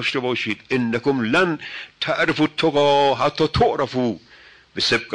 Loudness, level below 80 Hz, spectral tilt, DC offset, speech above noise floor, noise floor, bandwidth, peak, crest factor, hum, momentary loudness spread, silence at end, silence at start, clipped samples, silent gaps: -20 LUFS; -46 dBFS; -5 dB/octave; under 0.1%; 28 dB; -48 dBFS; 10 kHz; -8 dBFS; 12 dB; none; 10 LU; 0 s; 0 s; under 0.1%; none